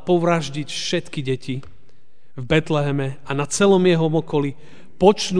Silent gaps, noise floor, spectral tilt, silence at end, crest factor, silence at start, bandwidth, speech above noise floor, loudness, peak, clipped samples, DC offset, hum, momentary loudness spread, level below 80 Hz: none; -59 dBFS; -5.5 dB/octave; 0 s; 20 dB; 0.05 s; 10 kHz; 40 dB; -20 LUFS; 0 dBFS; under 0.1%; 2%; none; 11 LU; -48 dBFS